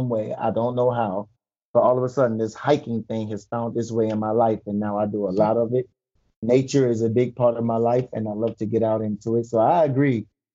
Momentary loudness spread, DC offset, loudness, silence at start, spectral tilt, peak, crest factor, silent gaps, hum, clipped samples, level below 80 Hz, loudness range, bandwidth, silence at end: 9 LU; under 0.1%; -22 LUFS; 0 s; -7.5 dB/octave; -6 dBFS; 16 dB; 1.65-1.74 s, 6.36-6.42 s; none; under 0.1%; -64 dBFS; 2 LU; 7.8 kHz; 0.3 s